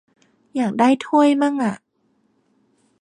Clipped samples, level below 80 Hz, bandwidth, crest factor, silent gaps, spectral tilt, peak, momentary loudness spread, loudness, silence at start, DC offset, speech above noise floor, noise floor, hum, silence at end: under 0.1%; -72 dBFS; 10.5 kHz; 16 dB; none; -5.5 dB/octave; -4 dBFS; 12 LU; -18 LUFS; 0.55 s; under 0.1%; 48 dB; -65 dBFS; none; 1.25 s